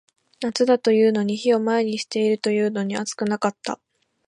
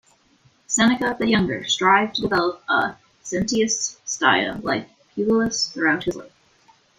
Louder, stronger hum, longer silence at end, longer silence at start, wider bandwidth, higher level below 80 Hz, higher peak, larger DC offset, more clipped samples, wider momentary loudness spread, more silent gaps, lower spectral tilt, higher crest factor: about the same, -22 LUFS vs -21 LUFS; neither; second, 0.5 s vs 0.7 s; second, 0.4 s vs 0.7 s; about the same, 11 kHz vs 11 kHz; second, -72 dBFS vs -52 dBFS; about the same, -4 dBFS vs -2 dBFS; neither; neither; about the same, 11 LU vs 10 LU; neither; first, -5 dB/octave vs -3 dB/octave; about the same, 18 dB vs 20 dB